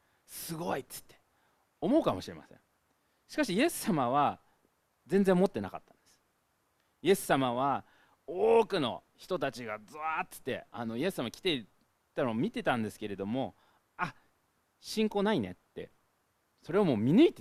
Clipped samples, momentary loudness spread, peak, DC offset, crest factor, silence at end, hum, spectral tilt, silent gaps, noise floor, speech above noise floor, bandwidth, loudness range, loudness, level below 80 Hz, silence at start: under 0.1%; 16 LU; -10 dBFS; under 0.1%; 22 dB; 0 s; none; -5.5 dB/octave; none; -75 dBFS; 45 dB; 15.5 kHz; 5 LU; -32 LUFS; -64 dBFS; 0.3 s